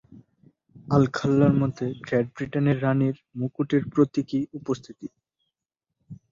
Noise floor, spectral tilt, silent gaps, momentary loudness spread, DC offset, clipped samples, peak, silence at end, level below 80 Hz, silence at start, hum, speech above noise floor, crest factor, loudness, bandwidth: -86 dBFS; -8.5 dB/octave; none; 11 LU; under 0.1%; under 0.1%; -6 dBFS; 0.15 s; -58 dBFS; 0.15 s; none; 62 dB; 20 dB; -25 LUFS; 7.4 kHz